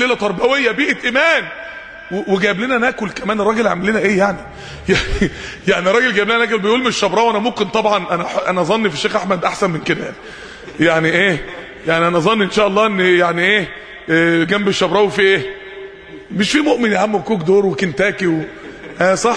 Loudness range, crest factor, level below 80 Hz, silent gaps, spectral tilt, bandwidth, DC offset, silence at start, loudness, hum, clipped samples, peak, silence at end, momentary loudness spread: 3 LU; 16 dB; -40 dBFS; none; -4.5 dB/octave; 10.5 kHz; under 0.1%; 0 s; -15 LUFS; none; under 0.1%; 0 dBFS; 0 s; 15 LU